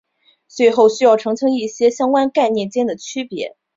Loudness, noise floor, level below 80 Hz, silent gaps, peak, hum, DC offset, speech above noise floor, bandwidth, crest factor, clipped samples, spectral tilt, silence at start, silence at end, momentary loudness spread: -16 LUFS; -55 dBFS; -64 dBFS; none; -2 dBFS; none; under 0.1%; 40 dB; 7.8 kHz; 16 dB; under 0.1%; -4.5 dB/octave; 0.55 s; 0.25 s; 13 LU